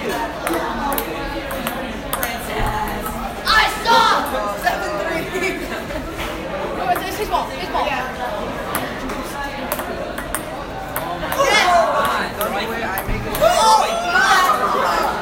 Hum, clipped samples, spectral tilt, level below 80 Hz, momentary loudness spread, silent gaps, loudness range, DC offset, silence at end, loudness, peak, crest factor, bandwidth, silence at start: none; under 0.1%; -3 dB/octave; -36 dBFS; 12 LU; none; 7 LU; under 0.1%; 0 s; -19 LUFS; 0 dBFS; 20 dB; 17 kHz; 0 s